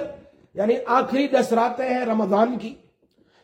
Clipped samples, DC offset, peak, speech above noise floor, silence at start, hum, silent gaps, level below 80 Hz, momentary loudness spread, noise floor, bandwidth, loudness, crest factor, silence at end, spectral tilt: under 0.1%; under 0.1%; -4 dBFS; 40 dB; 0 s; none; none; -66 dBFS; 14 LU; -61 dBFS; 16.5 kHz; -21 LUFS; 18 dB; 0.7 s; -6 dB/octave